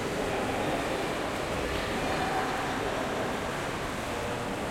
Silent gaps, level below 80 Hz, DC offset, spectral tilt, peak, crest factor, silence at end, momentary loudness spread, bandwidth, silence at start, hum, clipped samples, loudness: none; -46 dBFS; under 0.1%; -4.5 dB/octave; -18 dBFS; 14 dB; 0 s; 3 LU; 16.5 kHz; 0 s; none; under 0.1%; -31 LUFS